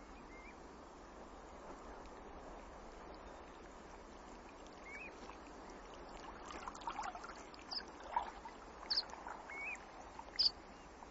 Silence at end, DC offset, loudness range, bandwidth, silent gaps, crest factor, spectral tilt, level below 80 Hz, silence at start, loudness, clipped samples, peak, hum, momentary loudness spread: 0 s; under 0.1%; 13 LU; 7.6 kHz; none; 26 dB; 0 dB/octave; -62 dBFS; 0 s; -46 LUFS; under 0.1%; -22 dBFS; none; 17 LU